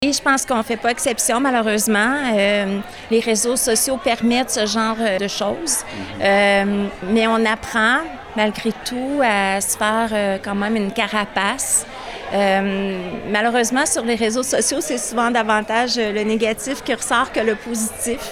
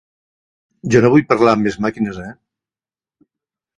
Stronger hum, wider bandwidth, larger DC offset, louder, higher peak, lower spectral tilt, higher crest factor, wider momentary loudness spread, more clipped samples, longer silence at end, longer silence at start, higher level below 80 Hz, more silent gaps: neither; first, 17 kHz vs 11 kHz; neither; second, -18 LUFS vs -15 LUFS; second, -4 dBFS vs 0 dBFS; second, -2.5 dB/octave vs -7 dB/octave; about the same, 14 dB vs 18 dB; second, 6 LU vs 19 LU; neither; second, 0 s vs 1.45 s; second, 0 s vs 0.85 s; about the same, -48 dBFS vs -50 dBFS; neither